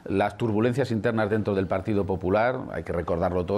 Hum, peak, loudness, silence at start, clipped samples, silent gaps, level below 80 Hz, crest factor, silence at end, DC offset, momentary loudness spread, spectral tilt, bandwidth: none; -12 dBFS; -26 LUFS; 0.05 s; under 0.1%; none; -50 dBFS; 14 dB; 0 s; under 0.1%; 4 LU; -8 dB/octave; 12.5 kHz